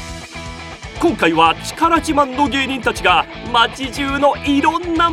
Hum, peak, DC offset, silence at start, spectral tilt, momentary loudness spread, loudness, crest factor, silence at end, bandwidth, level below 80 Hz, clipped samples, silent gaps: none; 0 dBFS; under 0.1%; 0 s; -4 dB/octave; 16 LU; -16 LUFS; 16 dB; 0 s; 15.5 kHz; -36 dBFS; under 0.1%; none